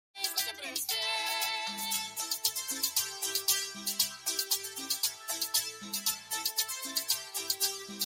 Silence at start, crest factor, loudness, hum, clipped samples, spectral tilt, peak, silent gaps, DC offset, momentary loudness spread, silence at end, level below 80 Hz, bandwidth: 0.15 s; 22 dB; -31 LUFS; none; under 0.1%; 1.5 dB/octave; -12 dBFS; none; under 0.1%; 4 LU; 0 s; -78 dBFS; 17 kHz